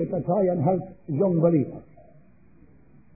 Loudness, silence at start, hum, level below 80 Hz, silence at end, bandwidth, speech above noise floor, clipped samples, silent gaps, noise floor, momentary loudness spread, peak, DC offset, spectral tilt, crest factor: -24 LUFS; 0 s; none; -60 dBFS; 1.35 s; 2.6 kHz; 32 dB; under 0.1%; none; -56 dBFS; 11 LU; -8 dBFS; 0.2%; -16 dB/octave; 18 dB